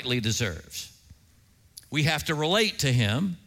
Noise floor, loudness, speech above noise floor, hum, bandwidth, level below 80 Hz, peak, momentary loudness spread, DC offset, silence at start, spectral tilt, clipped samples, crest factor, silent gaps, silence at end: -59 dBFS; -25 LUFS; 33 dB; none; 16.5 kHz; -54 dBFS; -8 dBFS; 14 LU; under 0.1%; 0 s; -4 dB/octave; under 0.1%; 18 dB; none; 0.1 s